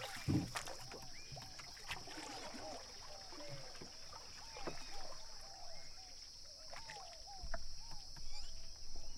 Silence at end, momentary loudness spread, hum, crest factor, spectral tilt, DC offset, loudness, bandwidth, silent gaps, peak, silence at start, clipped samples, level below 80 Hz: 0 s; 7 LU; none; 18 dB; -3.5 dB/octave; under 0.1%; -49 LUFS; 15.5 kHz; none; -26 dBFS; 0 s; under 0.1%; -54 dBFS